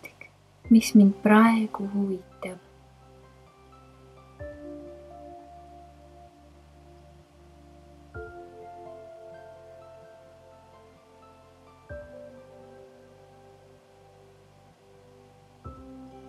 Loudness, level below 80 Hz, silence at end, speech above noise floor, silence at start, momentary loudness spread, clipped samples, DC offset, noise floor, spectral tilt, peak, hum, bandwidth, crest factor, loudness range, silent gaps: -22 LUFS; -58 dBFS; 0.55 s; 35 dB; 0.65 s; 31 LU; under 0.1%; under 0.1%; -56 dBFS; -6.5 dB/octave; -4 dBFS; none; 13.5 kHz; 26 dB; 27 LU; none